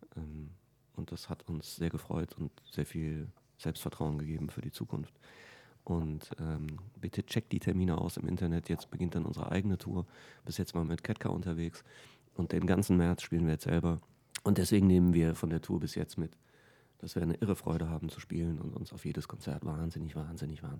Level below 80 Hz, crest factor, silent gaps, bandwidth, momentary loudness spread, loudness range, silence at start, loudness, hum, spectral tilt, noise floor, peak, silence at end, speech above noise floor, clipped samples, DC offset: -52 dBFS; 20 dB; none; 17.5 kHz; 14 LU; 9 LU; 0 s; -35 LUFS; none; -7 dB/octave; -64 dBFS; -14 dBFS; 0 s; 30 dB; under 0.1%; under 0.1%